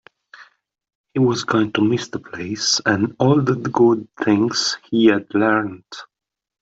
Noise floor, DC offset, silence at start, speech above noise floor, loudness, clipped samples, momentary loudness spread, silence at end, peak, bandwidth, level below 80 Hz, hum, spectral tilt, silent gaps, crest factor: -51 dBFS; under 0.1%; 0.4 s; 32 dB; -18 LUFS; under 0.1%; 13 LU; 0.55 s; -2 dBFS; 8 kHz; -60 dBFS; none; -4.5 dB/octave; 0.95-1.04 s; 16 dB